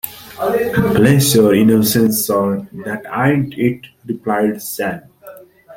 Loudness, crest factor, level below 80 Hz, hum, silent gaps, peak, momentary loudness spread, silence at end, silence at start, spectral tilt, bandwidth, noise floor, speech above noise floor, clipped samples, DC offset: -15 LUFS; 14 dB; -46 dBFS; none; none; -2 dBFS; 15 LU; 0 s; 0.05 s; -5.5 dB/octave; 17 kHz; -39 dBFS; 25 dB; under 0.1%; under 0.1%